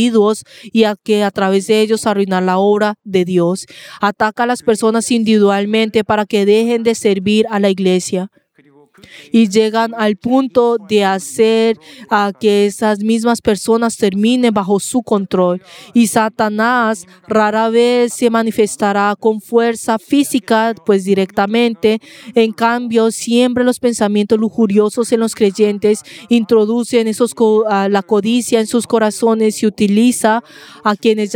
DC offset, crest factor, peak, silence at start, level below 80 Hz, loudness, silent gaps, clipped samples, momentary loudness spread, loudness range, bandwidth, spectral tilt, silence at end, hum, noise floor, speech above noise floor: under 0.1%; 14 dB; 0 dBFS; 0 s; -56 dBFS; -14 LUFS; none; under 0.1%; 4 LU; 1 LU; 17 kHz; -5 dB/octave; 0 s; none; -49 dBFS; 35 dB